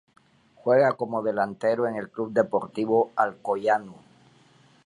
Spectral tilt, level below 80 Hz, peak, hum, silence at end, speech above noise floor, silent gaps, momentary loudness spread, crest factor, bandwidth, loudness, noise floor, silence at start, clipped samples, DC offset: -7 dB/octave; -72 dBFS; -6 dBFS; none; 0.9 s; 33 dB; none; 7 LU; 20 dB; 10.5 kHz; -25 LUFS; -58 dBFS; 0.65 s; under 0.1%; under 0.1%